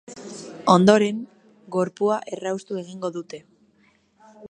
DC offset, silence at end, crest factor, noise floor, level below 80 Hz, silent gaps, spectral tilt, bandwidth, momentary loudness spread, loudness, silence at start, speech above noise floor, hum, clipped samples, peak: under 0.1%; 0.05 s; 22 dB; -61 dBFS; -68 dBFS; none; -6 dB/octave; 10 kHz; 22 LU; -22 LUFS; 0.1 s; 40 dB; none; under 0.1%; -2 dBFS